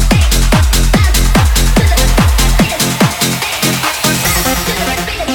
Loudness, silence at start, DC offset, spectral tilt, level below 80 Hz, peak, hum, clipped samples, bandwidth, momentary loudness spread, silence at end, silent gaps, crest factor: -11 LUFS; 0 s; under 0.1%; -4 dB/octave; -14 dBFS; 0 dBFS; none; under 0.1%; 19 kHz; 3 LU; 0 s; none; 10 dB